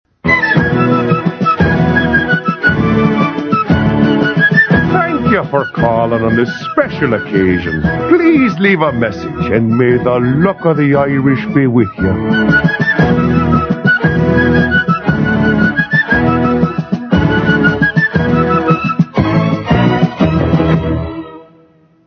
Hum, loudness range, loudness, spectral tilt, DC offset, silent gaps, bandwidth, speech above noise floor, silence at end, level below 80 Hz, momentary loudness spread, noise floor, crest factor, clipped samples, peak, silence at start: none; 1 LU; -12 LUFS; -8.5 dB/octave; under 0.1%; none; 6.4 kHz; 36 dB; 0.65 s; -32 dBFS; 5 LU; -47 dBFS; 12 dB; under 0.1%; 0 dBFS; 0.25 s